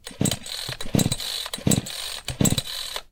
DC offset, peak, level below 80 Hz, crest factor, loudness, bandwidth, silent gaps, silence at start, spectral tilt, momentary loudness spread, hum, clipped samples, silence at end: under 0.1%; -6 dBFS; -42 dBFS; 20 dB; -25 LUFS; 19 kHz; none; 0.05 s; -3.5 dB/octave; 8 LU; none; under 0.1%; 0.05 s